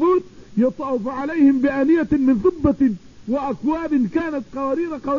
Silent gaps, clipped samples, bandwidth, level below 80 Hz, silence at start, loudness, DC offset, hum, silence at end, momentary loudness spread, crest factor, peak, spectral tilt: none; under 0.1%; 7 kHz; -44 dBFS; 0 s; -20 LUFS; 0.4%; none; 0 s; 8 LU; 16 dB; -4 dBFS; -8.5 dB/octave